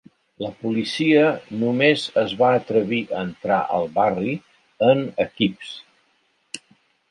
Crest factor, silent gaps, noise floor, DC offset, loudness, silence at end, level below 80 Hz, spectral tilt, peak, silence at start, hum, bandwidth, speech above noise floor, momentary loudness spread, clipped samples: 18 dB; none; -65 dBFS; under 0.1%; -21 LUFS; 0.55 s; -62 dBFS; -6 dB/octave; -4 dBFS; 0.4 s; none; 11.5 kHz; 45 dB; 18 LU; under 0.1%